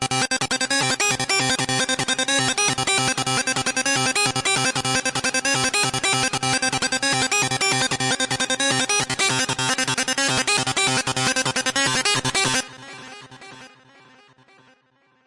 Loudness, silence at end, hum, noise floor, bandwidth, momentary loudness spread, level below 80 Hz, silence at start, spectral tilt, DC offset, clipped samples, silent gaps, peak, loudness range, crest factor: -20 LUFS; 1.6 s; none; -62 dBFS; 11.5 kHz; 3 LU; -54 dBFS; 0 s; -1.5 dB/octave; under 0.1%; under 0.1%; none; -6 dBFS; 3 LU; 18 dB